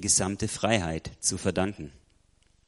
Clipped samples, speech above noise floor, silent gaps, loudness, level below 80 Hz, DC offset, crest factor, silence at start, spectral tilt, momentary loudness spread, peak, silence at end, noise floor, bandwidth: under 0.1%; 36 dB; none; -28 LUFS; -50 dBFS; under 0.1%; 22 dB; 0 s; -3.5 dB/octave; 12 LU; -6 dBFS; 0.75 s; -64 dBFS; 11.5 kHz